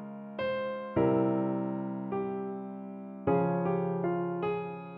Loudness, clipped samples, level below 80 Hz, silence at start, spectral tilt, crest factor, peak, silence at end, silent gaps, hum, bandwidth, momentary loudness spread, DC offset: -32 LUFS; under 0.1%; -64 dBFS; 0 s; -7.5 dB/octave; 16 dB; -16 dBFS; 0 s; none; none; 5.2 kHz; 11 LU; under 0.1%